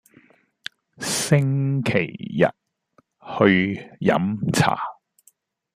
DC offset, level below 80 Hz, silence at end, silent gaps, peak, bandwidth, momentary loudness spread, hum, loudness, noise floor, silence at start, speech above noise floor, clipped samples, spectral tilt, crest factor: under 0.1%; -58 dBFS; 0.85 s; none; -2 dBFS; 15 kHz; 16 LU; none; -21 LUFS; -62 dBFS; 1 s; 42 dB; under 0.1%; -5.5 dB/octave; 20 dB